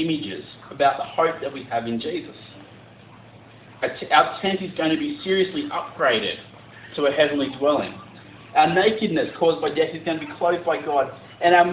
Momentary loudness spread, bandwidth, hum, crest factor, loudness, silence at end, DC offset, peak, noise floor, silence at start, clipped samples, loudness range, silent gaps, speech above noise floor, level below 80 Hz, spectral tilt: 15 LU; 4 kHz; none; 20 dB; -22 LUFS; 0 s; under 0.1%; -2 dBFS; -46 dBFS; 0 s; under 0.1%; 5 LU; none; 25 dB; -60 dBFS; -9 dB/octave